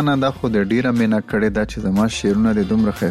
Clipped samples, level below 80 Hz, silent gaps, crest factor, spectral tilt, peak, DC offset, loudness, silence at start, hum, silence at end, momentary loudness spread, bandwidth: under 0.1%; -38 dBFS; none; 10 dB; -6.5 dB/octave; -8 dBFS; 0.2%; -18 LUFS; 0 s; none; 0 s; 3 LU; 13 kHz